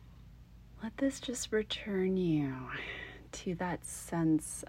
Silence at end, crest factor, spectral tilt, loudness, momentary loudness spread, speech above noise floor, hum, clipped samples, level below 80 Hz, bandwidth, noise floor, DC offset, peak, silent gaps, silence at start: 0 s; 16 dB; -5 dB/octave; -35 LUFS; 12 LU; 20 dB; 60 Hz at -60 dBFS; under 0.1%; -56 dBFS; 16 kHz; -55 dBFS; under 0.1%; -20 dBFS; none; 0 s